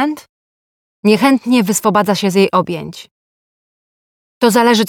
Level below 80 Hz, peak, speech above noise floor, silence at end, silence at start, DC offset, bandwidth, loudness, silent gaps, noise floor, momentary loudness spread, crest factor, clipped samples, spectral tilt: -60 dBFS; 0 dBFS; over 77 dB; 0 s; 0 s; under 0.1%; 19 kHz; -13 LUFS; 0.29-1.03 s, 3.11-4.41 s; under -90 dBFS; 12 LU; 14 dB; under 0.1%; -4.5 dB/octave